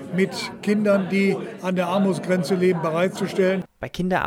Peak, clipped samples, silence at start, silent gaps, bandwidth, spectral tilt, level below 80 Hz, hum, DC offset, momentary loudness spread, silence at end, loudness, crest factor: -8 dBFS; under 0.1%; 0 s; none; 15 kHz; -6.5 dB/octave; -56 dBFS; none; under 0.1%; 7 LU; 0 s; -22 LUFS; 14 dB